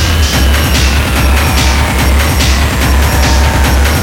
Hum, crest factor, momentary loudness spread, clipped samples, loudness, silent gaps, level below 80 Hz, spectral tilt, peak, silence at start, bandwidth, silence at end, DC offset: none; 8 dB; 1 LU; under 0.1%; -10 LUFS; none; -10 dBFS; -4 dB/octave; 0 dBFS; 0 s; 17 kHz; 0 s; under 0.1%